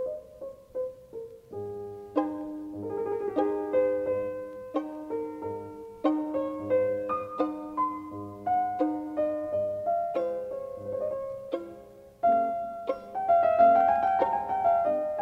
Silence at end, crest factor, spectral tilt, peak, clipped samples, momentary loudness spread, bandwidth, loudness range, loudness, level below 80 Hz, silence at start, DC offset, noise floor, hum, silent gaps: 0 s; 18 dB; -8 dB/octave; -10 dBFS; under 0.1%; 14 LU; 6 kHz; 6 LU; -29 LUFS; -64 dBFS; 0 s; under 0.1%; -49 dBFS; none; none